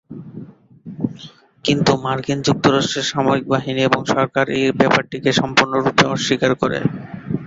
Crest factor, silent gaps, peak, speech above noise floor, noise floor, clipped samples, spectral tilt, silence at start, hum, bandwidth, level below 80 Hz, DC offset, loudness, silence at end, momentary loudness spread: 18 dB; none; 0 dBFS; 24 dB; -41 dBFS; under 0.1%; -5 dB/octave; 0.1 s; none; 8 kHz; -52 dBFS; under 0.1%; -18 LUFS; 0 s; 13 LU